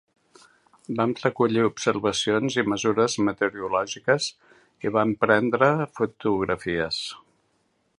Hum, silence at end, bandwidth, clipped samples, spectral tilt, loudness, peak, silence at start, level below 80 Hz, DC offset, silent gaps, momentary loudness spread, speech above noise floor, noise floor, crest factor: none; 0.8 s; 11 kHz; under 0.1%; -4.5 dB/octave; -24 LUFS; -2 dBFS; 0.9 s; -58 dBFS; under 0.1%; none; 7 LU; 46 dB; -69 dBFS; 22 dB